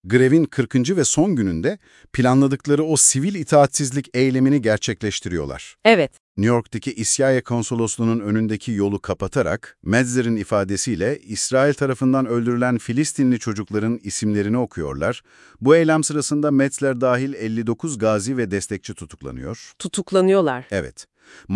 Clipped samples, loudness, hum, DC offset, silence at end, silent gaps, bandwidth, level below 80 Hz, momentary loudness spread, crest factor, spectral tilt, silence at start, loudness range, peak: under 0.1%; -20 LUFS; none; under 0.1%; 0 s; 6.20-6.35 s; 12 kHz; -50 dBFS; 11 LU; 20 dB; -5 dB/octave; 0.05 s; 5 LU; 0 dBFS